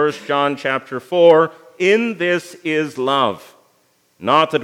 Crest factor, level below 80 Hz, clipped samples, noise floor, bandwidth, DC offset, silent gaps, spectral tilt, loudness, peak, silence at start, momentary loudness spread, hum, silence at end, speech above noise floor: 16 dB; -74 dBFS; under 0.1%; -60 dBFS; 13.5 kHz; under 0.1%; none; -5 dB/octave; -17 LUFS; 0 dBFS; 0 s; 10 LU; none; 0 s; 43 dB